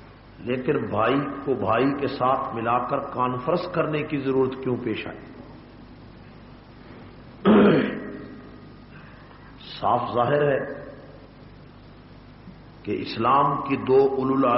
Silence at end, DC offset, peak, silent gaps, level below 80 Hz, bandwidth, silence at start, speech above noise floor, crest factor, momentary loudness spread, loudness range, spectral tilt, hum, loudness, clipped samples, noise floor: 0 s; under 0.1%; -6 dBFS; none; -54 dBFS; 5.8 kHz; 0 s; 23 dB; 18 dB; 25 LU; 5 LU; -5.5 dB/octave; none; -23 LUFS; under 0.1%; -46 dBFS